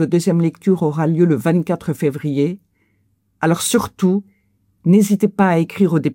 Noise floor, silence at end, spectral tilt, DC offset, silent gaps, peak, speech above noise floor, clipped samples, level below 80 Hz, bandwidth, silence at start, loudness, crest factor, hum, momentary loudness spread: -63 dBFS; 0 s; -6.5 dB/octave; under 0.1%; none; -4 dBFS; 47 dB; under 0.1%; -58 dBFS; 17 kHz; 0 s; -17 LUFS; 14 dB; none; 7 LU